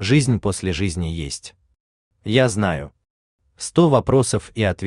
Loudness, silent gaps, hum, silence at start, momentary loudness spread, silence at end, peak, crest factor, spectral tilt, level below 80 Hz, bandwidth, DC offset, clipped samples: -20 LUFS; 1.80-2.11 s, 3.10-3.39 s; none; 0 s; 15 LU; 0 s; -2 dBFS; 18 dB; -5.5 dB/octave; -44 dBFS; 12.5 kHz; under 0.1%; under 0.1%